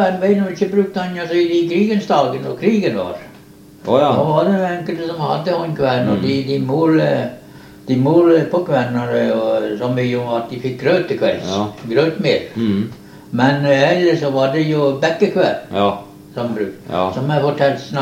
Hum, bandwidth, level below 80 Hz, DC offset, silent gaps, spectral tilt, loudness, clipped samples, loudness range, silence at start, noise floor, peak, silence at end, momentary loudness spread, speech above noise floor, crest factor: none; 16 kHz; -56 dBFS; under 0.1%; none; -7 dB/octave; -17 LUFS; under 0.1%; 2 LU; 0 s; -41 dBFS; 0 dBFS; 0 s; 9 LU; 26 dB; 16 dB